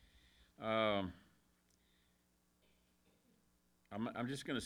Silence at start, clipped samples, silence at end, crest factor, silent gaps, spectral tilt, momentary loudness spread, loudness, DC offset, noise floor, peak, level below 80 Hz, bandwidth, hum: 0.6 s; under 0.1%; 0 s; 24 dB; none; -5 dB/octave; 12 LU; -41 LUFS; under 0.1%; -77 dBFS; -22 dBFS; -72 dBFS; 19.5 kHz; 60 Hz at -80 dBFS